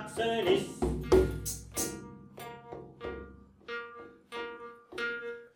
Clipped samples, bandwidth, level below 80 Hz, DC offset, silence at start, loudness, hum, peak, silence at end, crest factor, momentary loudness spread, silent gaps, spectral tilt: under 0.1%; 19 kHz; -46 dBFS; under 0.1%; 0 s; -33 LUFS; none; -12 dBFS; 0.1 s; 22 dB; 21 LU; none; -4.5 dB/octave